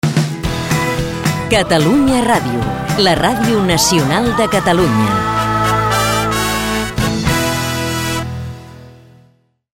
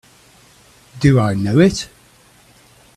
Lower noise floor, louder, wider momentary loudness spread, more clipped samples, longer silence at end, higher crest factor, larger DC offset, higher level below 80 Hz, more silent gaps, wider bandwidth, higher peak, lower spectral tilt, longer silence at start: about the same, -53 dBFS vs -50 dBFS; about the same, -14 LUFS vs -15 LUFS; second, 7 LU vs 12 LU; neither; second, 0.8 s vs 1.1 s; about the same, 14 dB vs 18 dB; neither; first, -32 dBFS vs -44 dBFS; neither; first, 16.5 kHz vs 13 kHz; about the same, 0 dBFS vs 0 dBFS; second, -4.5 dB/octave vs -6.5 dB/octave; second, 0.05 s vs 0.95 s